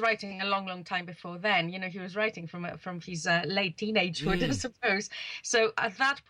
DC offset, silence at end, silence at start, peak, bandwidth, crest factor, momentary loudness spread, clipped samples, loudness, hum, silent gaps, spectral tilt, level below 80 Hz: under 0.1%; 0.1 s; 0 s; -14 dBFS; 12.5 kHz; 18 dB; 11 LU; under 0.1%; -30 LUFS; none; none; -3.5 dB/octave; -52 dBFS